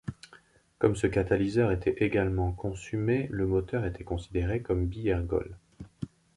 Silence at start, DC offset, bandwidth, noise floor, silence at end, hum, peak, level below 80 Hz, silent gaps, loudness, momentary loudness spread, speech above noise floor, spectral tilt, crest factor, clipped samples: 0.05 s; under 0.1%; 11.5 kHz; -59 dBFS; 0.3 s; none; -10 dBFS; -42 dBFS; none; -29 LUFS; 14 LU; 30 dB; -8 dB/octave; 20 dB; under 0.1%